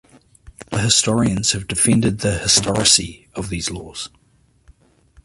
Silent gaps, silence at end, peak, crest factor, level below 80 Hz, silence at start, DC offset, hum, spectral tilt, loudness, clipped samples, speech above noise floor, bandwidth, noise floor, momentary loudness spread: none; 1.2 s; 0 dBFS; 20 dB; -42 dBFS; 0.45 s; under 0.1%; none; -3 dB/octave; -17 LUFS; under 0.1%; 34 dB; 12 kHz; -53 dBFS; 17 LU